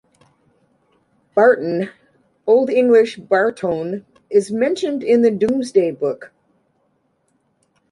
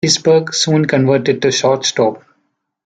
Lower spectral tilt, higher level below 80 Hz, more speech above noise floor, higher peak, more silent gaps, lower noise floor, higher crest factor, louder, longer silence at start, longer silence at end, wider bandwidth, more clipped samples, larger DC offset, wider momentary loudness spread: first, -6 dB/octave vs -4 dB/octave; second, -64 dBFS vs -58 dBFS; second, 49 dB vs 53 dB; about the same, -2 dBFS vs 0 dBFS; neither; about the same, -65 dBFS vs -67 dBFS; about the same, 16 dB vs 14 dB; second, -17 LUFS vs -13 LUFS; first, 1.35 s vs 0.05 s; first, 1.65 s vs 0.65 s; first, 11.5 kHz vs 9.4 kHz; neither; neither; first, 11 LU vs 3 LU